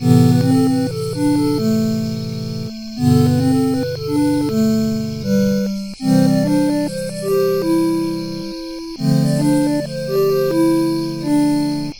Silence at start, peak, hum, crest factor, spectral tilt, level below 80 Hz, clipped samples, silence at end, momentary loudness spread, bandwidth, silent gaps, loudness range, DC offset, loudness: 0 s; 0 dBFS; none; 16 dB; -7 dB/octave; -46 dBFS; under 0.1%; 0 s; 10 LU; 17.5 kHz; none; 1 LU; 0.4%; -17 LUFS